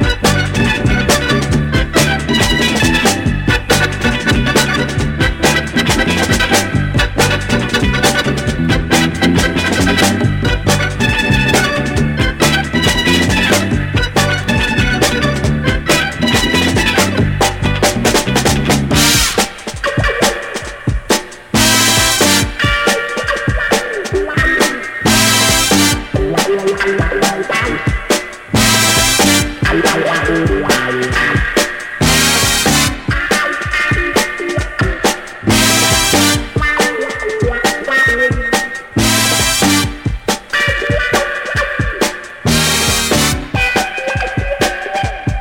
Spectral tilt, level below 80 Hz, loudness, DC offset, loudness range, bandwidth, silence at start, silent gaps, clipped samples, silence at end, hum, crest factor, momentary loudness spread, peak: -3.5 dB/octave; -24 dBFS; -13 LUFS; under 0.1%; 2 LU; 17 kHz; 0 s; none; under 0.1%; 0 s; none; 14 dB; 7 LU; 0 dBFS